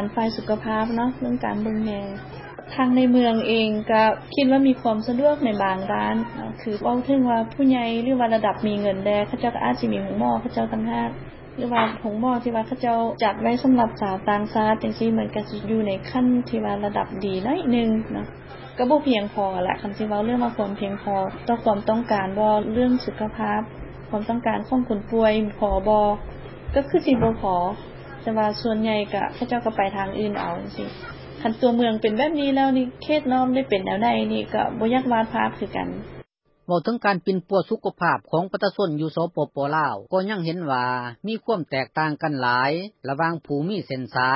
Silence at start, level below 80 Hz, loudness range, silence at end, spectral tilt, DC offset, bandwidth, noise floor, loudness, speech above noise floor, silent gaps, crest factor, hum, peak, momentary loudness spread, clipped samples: 0 s; -46 dBFS; 3 LU; 0 s; -10.5 dB/octave; under 0.1%; 5.8 kHz; -47 dBFS; -23 LUFS; 25 dB; none; 16 dB; none; -6 dBFS; 9 LU; under 0.1%